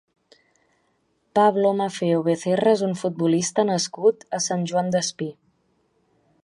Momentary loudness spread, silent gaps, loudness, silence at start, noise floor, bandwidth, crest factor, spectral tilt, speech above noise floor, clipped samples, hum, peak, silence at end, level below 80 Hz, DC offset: 7 LU; none; -22 LUFS; 1.35 s; -68 dBFS; 11.5 kHz; 18 dB; -5 dB/octave; 47 dB; under 0.1%; none; -6 dBFS; 1.1 s; -70 dBFS; under 0.1%